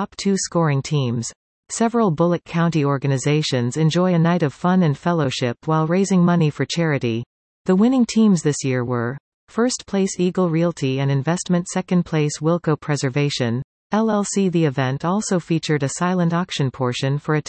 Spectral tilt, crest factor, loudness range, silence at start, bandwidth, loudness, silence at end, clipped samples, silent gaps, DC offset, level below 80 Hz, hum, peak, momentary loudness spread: -6 dB/octave; 14 dB; 2 LU; 0 s; 8.8 kHz; -20 LUFS; 0.05 s; under 0.1%; 1.36-1.63 s, 7.26-7.65 s, 9.20-9.47 s, 13.64-13.90 s; under 0.1%; -58 dBFS; none; -6 dBFS; 7 LU